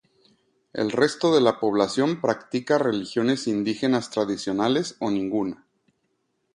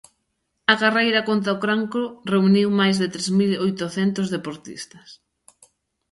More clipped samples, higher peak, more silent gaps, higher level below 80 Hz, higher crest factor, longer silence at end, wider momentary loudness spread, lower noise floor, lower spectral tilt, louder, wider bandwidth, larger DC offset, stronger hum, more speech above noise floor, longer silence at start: neither; about the same, -4 dBFS vs -2 dBFS; neither; about the same, -64 dBFS vs -66 dBFS; about the same, 20 dB vs 20 dB; about the same, 1 s vs 0.95 s; second, 8 LU vs 14 LU; about the same, -73 dBFS vs -74 dBFS; about the same, -5 dB/octave vs -5 dB/octave; second, -24 LUFS vs -20 LUFS; about the same, 11 kHz vs 11.5 kHz; neither; neither; about the same, 50 dB vs 53 dB; about the same, 0.75 s vs 0.7 s